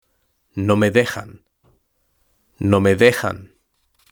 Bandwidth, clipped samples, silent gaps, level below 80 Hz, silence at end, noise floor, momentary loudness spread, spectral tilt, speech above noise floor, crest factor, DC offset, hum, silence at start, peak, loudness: over 20 kHz; under 0.1%; none; -54 dBFS; 0.65 s; -67 dBFS; 18 LU; -6 dB/octave; 50 dB; 20 dB; under 0.1%; none; 0.55 s; 0 dBFS; -17 LUFS